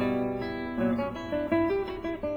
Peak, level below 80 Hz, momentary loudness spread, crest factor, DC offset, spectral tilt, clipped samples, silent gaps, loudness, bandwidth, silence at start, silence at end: -14 dBFS; -50 dBFS; 6 LU; 16 dB; under 0.1%; -8 dB/octave; under 0.1%; none; -30 LUFS; 7 kHz; 0 s; 0 s